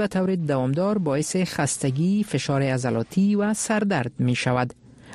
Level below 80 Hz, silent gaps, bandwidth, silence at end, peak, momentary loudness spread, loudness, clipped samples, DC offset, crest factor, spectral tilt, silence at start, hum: -56 dBFS; none; 13.5 kHz; 0 s; -8 dBFS; 3 LU; -23 LUFS; under 0.1%; under 0.1%; 14 dB; -5.5 dB/octave; 0 s; none